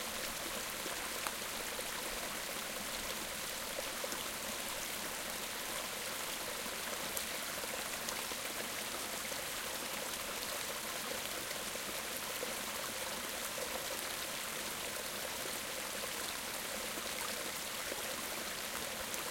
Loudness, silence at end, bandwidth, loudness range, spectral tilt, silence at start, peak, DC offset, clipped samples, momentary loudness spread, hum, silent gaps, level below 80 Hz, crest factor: -39 LUFS; 0 s; 17 kHz; 0 LU; -0.5 dB/octave; 0 s; -16 dBFS; under 0.1%; under 0.1%; 1 LU; none; none; -64 dBFS; 26 dB